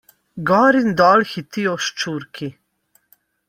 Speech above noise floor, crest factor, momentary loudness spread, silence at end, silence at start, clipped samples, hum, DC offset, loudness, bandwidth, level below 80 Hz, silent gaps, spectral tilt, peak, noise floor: 45 dB; 18 dB; 18 LU; 0.95 s; 0.35 s; under 0.1%; none; under 0.1%; -17 LUFS; 16 kHz; -60 dBFS; none; -5 dB/octave; -2 dBFS; -62 dBFS